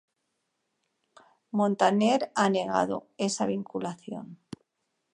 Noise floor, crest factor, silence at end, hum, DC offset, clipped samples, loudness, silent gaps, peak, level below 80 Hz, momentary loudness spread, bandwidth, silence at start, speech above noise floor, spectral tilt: -80 dBFS; 22 dB; 0.8 s; none; under 0.1%; under 0.1%; -27 LUFS; none; -8 dBFS; -74 dBFS; 20 LU; 11 kHz; 1.55 s; 53 dB; -5 dB/octave